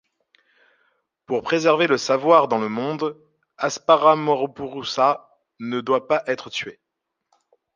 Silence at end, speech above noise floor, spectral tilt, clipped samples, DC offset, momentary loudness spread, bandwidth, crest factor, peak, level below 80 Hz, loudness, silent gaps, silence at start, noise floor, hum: 1.05 s; 60 dB; -4.5 dB/octave; under 0.1%; under 0.1%; 13 LU; 9.6 kHz; 20 dB; -2 dBFS; -68 dBFS; -21 LUFS; none; 1.3 s; -80 dBFS; none